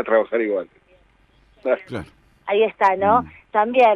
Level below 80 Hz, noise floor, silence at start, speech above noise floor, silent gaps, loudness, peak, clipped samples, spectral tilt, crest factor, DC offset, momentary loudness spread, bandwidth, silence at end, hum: -56 dBFS; -57 dBFS; 0 s; 38 dB; none; -20 LUFS; -4 dBFS; under 0.1%; -6.5 dB/octave; 16 dB; under 0.1%; 17 LU; 10 kHz; 0 s; none